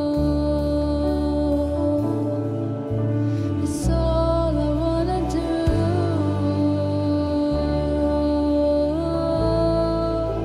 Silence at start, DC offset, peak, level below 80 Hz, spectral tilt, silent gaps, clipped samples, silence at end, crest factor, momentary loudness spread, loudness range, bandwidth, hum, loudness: 0 s; under 0.1%; -8 dBFS; -30 dBFS; -8 dB/octave; none; under 0.1%; 0 s; 14 dB; 3 LU; 1 LU; 12 kHz; none; -22 LUFS